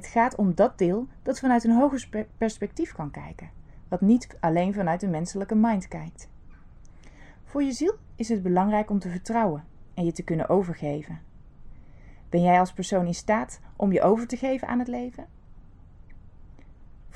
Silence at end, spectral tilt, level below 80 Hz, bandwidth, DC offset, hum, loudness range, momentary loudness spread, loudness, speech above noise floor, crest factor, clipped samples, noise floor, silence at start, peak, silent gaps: 0.05 s; -7 dB/octave; -48 dBFS; 10.5 kHz; under 0.1%; none; 4 LU; 15 LU; -25 LUFS; 23 dB; 18 dB; under 0.1%; -48 dBFS; 0 s; -8 dBFS; none